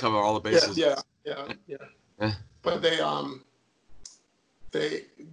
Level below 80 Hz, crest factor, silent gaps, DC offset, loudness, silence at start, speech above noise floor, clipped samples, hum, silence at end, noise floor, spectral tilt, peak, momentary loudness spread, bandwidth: -60 dBFS; 20 dB; none; under 0.1%; -28 LUFS; 0 s; 36 dB; under 0.1%; none; 0 s; -64 dBFS; -4 dB/octave; -8 dBFS; 21 LU; 11 kHz